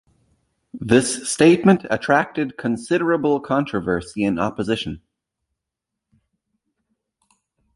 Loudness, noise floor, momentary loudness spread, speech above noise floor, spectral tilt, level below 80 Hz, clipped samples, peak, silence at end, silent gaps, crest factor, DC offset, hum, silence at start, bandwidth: -19 LUFS; -83 dBFS; 10 LU; 64 dB; -5 dB/octave; -52 dBFS; under 0.1%; -2 dBFS; 2.75 s; none; 20 dB; under 0.1%; none; 0.75 s; 11.5 kHz